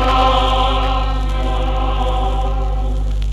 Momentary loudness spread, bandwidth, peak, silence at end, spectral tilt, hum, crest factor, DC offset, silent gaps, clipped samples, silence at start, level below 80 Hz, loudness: 7 LU; 7.8 kHz; -2 dBFS; 0 s; -6 dB/octave; 50 Hz at -15 dBFS; 14 dB; under 0.1%; none; under 0.1%; 0 s; -18 dBFS; -18 LUFS